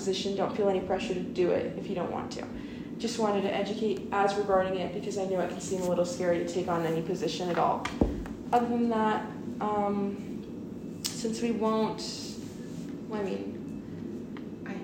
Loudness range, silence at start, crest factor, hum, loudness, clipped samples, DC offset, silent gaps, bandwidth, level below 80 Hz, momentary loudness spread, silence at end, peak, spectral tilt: 4 LU; 0 s; 20 dB; none; -31 LUFS; under 0.1%; under 0.1%; none; 16 kHz; -52 dBFS; 12 LU; 0 s; -10 dBFS; -5.5 dB/octave